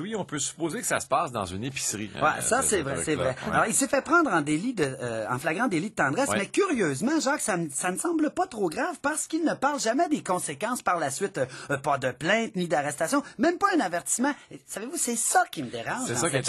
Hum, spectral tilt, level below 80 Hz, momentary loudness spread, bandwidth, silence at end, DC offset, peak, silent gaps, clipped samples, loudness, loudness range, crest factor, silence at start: none; -3.5 dB/octave; -60 dBFS; 7 LU; 13 kHz; 0 s; under 0.1%; -10 dBFS; none; under 0.1%; -26 LUFS; 2 LU; 18 dB; 0 s